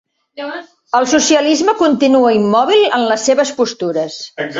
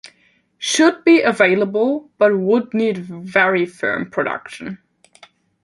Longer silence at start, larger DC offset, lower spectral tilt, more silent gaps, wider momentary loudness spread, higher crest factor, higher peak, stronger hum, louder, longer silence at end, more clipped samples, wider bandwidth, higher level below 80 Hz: first, 0.35 s vs 0.05 s; neither; about the same, -3 dB/octave vs -4 dB/octave; neither; about the same, 15 LU vs 14 LU; second, 12 dB vs 18 dB; about the same, -2 dBFS vs 0 dBFS; neither; first, -13 LUFS vs -17 LUFS; second, 0 s vs 0.9 s; neither; second, 8 kHz vs 11.5 kHz; first, -58 dBFS vs -64 dBFS